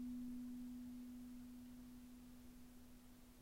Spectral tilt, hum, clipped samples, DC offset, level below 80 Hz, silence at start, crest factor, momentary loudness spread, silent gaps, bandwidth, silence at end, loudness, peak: -5.5 dB/octave; none; under 0.1%; under 0.1%; -68 dBFS; 0 s; 12 dB; 13 LU; none; 16 kHz; 0 s; -56 LUFS; -42 dBFS